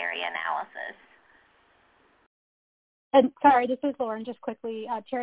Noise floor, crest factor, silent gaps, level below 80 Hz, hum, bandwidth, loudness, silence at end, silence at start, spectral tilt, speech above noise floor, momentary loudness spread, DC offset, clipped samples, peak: -63 dBFS; 22 dB; 2.26-3.11 s; -68 dBFS; none; 4 kHz; -26 LUFS; 0 s; 0 s; -2 dB/octave; 38 dB; 16 LU; under 0.1%; under 0.1%; -6 dBFS